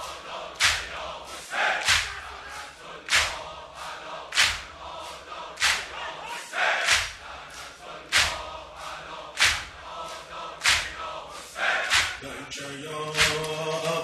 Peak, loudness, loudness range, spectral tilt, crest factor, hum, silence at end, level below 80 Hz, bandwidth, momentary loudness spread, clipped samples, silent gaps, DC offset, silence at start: -6 dBFS; -25 LUFS; 2 LU; -0.5 dB/octave; 24 dB; none; 0 s; -52 dBFS; 13 kHz; 16 LU; under 0.1%; none; under 0.1%; 0 s